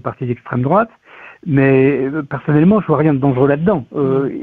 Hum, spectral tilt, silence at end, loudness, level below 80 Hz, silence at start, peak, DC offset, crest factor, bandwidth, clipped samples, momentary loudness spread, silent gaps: none; -11.5 dB/octave; 0 s; -15 LUFS; -48 dBFS; 0.05 s; -2 dBFS; under 0.1%; 12 dB; 4.1 kHz; under 0.1%; 10 LU; none